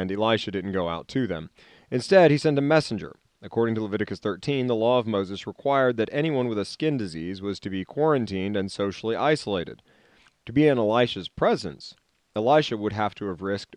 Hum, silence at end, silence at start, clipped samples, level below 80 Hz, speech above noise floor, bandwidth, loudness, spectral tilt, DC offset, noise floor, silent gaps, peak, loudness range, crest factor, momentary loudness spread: none; 0 s; 0 s; under 0.1%; -60 dBFS; 35 dB; 10.5 kHz; -25 LUFS; -6.5 dB/octave; under 0.1%; -60 dBFS; none; -6 dBFS; 3 LU; 18 dB; 12 LU